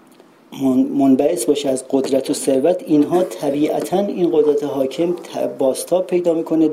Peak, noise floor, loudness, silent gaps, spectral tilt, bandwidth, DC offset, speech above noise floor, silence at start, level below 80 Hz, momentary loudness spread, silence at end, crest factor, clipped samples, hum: -2 dBFS; -48 dBFS; -18 LUFS; none; -5.5 dB/octave; 15.5 kHz; under 0.1%; 31 dB; 0.5 s; -62 dBFS; 6 LU; 0 s; 14 dB; under 0.1%; none